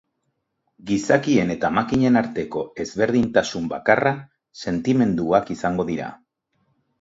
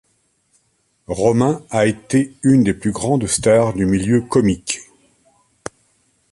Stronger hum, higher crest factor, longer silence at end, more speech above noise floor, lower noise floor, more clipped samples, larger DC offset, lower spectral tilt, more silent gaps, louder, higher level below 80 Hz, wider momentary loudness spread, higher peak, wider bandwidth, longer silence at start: neither; first, 22 dB vs 16 dB; second, 0.85 s vs 1.5 s; first, 54 dB vs 48 dB; first, -74 dBFS vs -64 dBFS; neither; neither; about the same, -6 dB/octave vs -6 dB/octave; neither; second, -21 LUFS vs -17 LUFS; second, -52 dBFS vs -44 dBFS; second, 10 LU vs 13 LU; about the same, 0 dBFS vs -2 dBFS; second, 7.8 kHz vs 11.5 kHz; second, 0.85 s vs 1.1 s